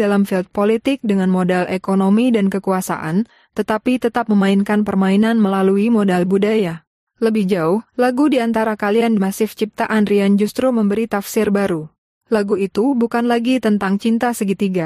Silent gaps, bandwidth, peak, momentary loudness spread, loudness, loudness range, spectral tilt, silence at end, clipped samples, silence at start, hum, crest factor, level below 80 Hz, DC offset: 6.87-7.07 s, 11.98-12.21 s; 15 kHz; -6 dBFS; 5 LU; -17 LUFS; 2 LU; -6.5 dB/octave; 0 s; under 0.1%; 0 s; none; 10 dB; -56 dBFS; under 0.1%